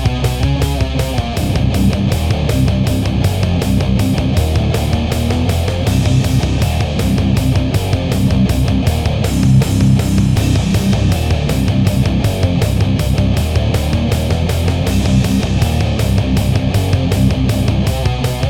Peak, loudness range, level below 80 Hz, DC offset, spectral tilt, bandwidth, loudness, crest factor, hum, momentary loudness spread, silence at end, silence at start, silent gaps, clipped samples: 0 dBFS; 2 LU; -20 dBFS; 0.2%; -6.5 dB/octave; 17 kHz; -15 LUFS; 12 dB; none; 3 LU; 0 s; 0 s; none; under 0.1%